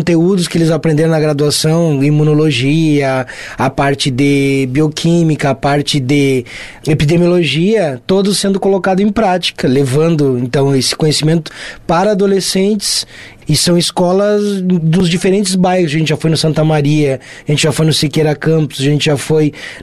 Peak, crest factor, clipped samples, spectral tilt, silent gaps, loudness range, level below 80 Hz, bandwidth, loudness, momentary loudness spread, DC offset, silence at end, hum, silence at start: -2 dBFS; 10 dB; under 0.1%; -5.5 dB/octave; none; 1 LU; -40 dBFS; 13.5 kHz; -12 LUFS; 5 LU; under 0.1%; 0 s; none; 0 s